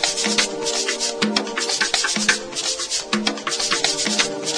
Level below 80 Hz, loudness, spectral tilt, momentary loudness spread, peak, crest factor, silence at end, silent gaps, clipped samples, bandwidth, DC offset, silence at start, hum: -54 dBFS; -20 LUFS; -1 dB/octave; 4 LU; 0 dBFS; 22 dB; 0 s; none; under 0.1%; 10.5 kHz; under 0.1%; 0 s; none